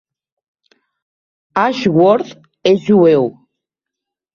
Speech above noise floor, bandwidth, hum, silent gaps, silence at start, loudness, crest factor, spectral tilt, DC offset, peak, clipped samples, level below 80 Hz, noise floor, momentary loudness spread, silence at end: 70 dB; 7.2 kHz; none; none; 1.55 s; -14 LUFS; 14 dB; -7 dB/octave; under 0.1%; -2 dBFS; under 0.1%; -58 dBFS; -82 dBFS; 12 LU; 1.05 s